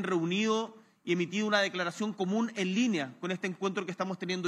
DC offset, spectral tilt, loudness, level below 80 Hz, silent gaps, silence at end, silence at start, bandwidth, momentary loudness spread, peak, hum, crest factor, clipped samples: under 0.1%; -5 dB/octave; -31 LUFS; under -90 dBFS; none; 0 s; 0 s; 11.5 kHz; 7 LU; -12 dBFS; none; 20 dB; under 0.1%